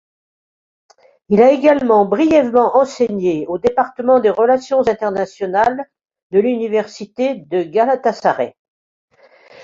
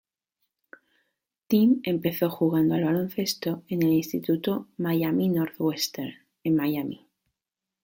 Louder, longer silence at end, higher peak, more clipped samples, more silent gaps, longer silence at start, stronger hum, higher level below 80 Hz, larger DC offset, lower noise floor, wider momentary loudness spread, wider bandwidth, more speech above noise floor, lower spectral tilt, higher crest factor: first, -15 LUFS vs -26 LUFS; second, 0 s vs 0.85 s; first, -2 dBFS vs -10 dBFS; neither; first, 6.23-6.30 s, 8.59-9.08 s vs none; second, 1.3 s vs 1.5 s; neither; first, -56 dBFS vs -66 dBFS; neither; second, -46 dBFS vs -88 dBFS; about the same, 9 LU vs 9 LU; second, 7.6 kHz vs 17 kHz; second, 31 dB vs 63 dB; about the same, -6.5 dB/octave vs -6 dB/octave; about the same, 14 dB vs 16 dB